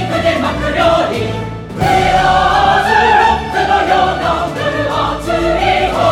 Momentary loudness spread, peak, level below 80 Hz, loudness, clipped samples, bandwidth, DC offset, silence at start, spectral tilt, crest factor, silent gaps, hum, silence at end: 7 LU; 0 dBFS; -30 dBFS; -13 LUFS; under 0.1%; 16.5 kHz; under 0.1%; 0 s; -5 dB/octave; 12 dB; none; none; 0 s